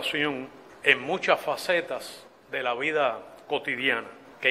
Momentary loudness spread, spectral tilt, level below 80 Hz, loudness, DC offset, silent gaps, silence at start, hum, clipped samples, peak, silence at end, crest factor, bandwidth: 17 LU; -3.5 dB/octave; -72 dBFS; -26 LUFS; under 0.1%; none; 0 s; none; under 0.1%; -4 dBFS; 0 s; 24 dB; 16 kHz